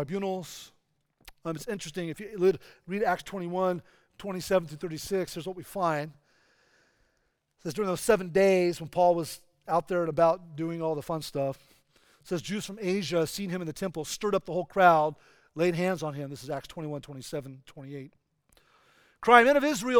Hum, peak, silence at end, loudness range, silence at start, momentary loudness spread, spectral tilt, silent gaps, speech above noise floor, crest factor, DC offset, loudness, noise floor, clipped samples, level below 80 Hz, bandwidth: none; -2 dBFS; 0 s; 7 LU; 0 s; 16 LU; -5 dB/octave; none; 47 dB; 26 dB; under 0.1%; -28 LUFS; -75 dBFS; under 0.1%; -62 dBFS; over 20 kHz